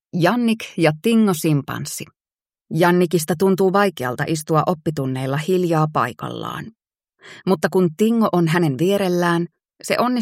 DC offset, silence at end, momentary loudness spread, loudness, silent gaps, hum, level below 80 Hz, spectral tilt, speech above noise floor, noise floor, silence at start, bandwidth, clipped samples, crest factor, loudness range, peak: under 0.1%; 0 s; 12 LU; -19 LUFS; 2.35-2.39 s; none; -62 dBFS; -6 dB/octave; over 71 dB; under -90 dBFS; 0.15 s; 16.5 kHz; under 0.1%; 18 dB; 3 LU; -2 dBFS